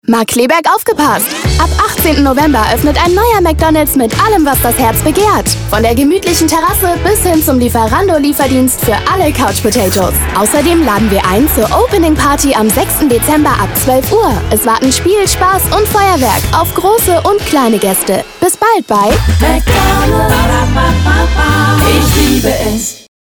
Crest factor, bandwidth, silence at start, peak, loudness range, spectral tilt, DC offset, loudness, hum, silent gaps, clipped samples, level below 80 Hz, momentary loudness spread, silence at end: 10 dB; over 20 kHz; 0.1 s; 0 dBFS; 1 LU; -4.5 dB/octave; under 0.1%; -9 LUFS; none; none; under 0.1%; -20 dBFS; 2 LU; 0.3 s